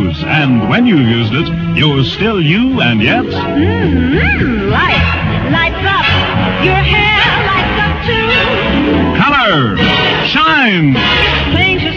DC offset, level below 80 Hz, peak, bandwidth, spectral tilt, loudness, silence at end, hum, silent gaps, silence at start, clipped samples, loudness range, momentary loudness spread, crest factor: under 0.1%; -26 dBFS; 0 dBFS; 7.2 kHz; -7 dB/octave; -10 LUFS; 0 s; none; none; 0 s; under 0.1%; 2 LU; 4 LU; 10 dB